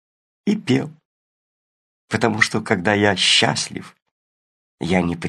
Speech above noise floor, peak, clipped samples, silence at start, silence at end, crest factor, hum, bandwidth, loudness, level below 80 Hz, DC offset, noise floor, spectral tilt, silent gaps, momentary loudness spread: over 71 dB; 0 dBFS; under 0.1%; 0.45 s; 0 s; 22 dB; none; 12.5 kHz; -18 LUFS; -48 dBFS; under 0.1%; under -90 dBFS; -4 dB/octave; 1.05-2.08 s, 4.02-4.78 s; 14 LU